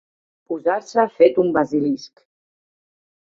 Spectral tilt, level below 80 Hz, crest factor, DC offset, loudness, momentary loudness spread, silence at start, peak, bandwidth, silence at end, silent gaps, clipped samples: -6.5 dB/octave; -62 dBFS; 20 dB; under 0.1%; -19 LUFS; 10 LU; 0.5 s; -2 dBFS; 7.6 kHz; 1.25 s; none; under 0.1%